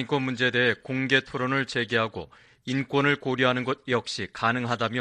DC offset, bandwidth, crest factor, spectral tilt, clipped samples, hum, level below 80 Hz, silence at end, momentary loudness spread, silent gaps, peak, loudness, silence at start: under 0.1%; 10.5 kHz; 20 dB; -5 dB/octave; under 0.1%; none; -62 dBFS; 0 s; 8 LU; none; -6 dBFS; -25 LUFS; 0 s